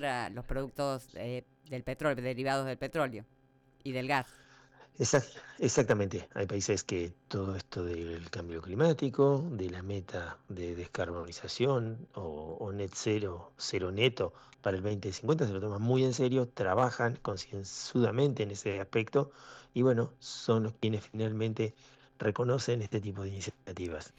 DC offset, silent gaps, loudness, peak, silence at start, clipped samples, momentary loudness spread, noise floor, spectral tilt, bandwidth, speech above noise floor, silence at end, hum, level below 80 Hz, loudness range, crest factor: under 0.1%; none; -33 LUFS; -16 dBFS; 0 s; under 0.1%; 12 LU; -60 dBFS; -5.5 dB/octave; 13.5 kHz; 27 dB; 0.1 s; none; -58 dBFS; 4 LU; 18 dB